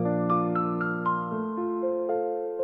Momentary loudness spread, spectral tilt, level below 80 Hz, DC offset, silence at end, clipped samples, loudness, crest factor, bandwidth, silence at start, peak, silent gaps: 5 LU; -11.5 dB/octave; -70 dBFS; under 0.1%; 0 s; under 0.1%; -28 LUFS; 14 dB; 4.2 kHz; 0 s; -14 dBFS; none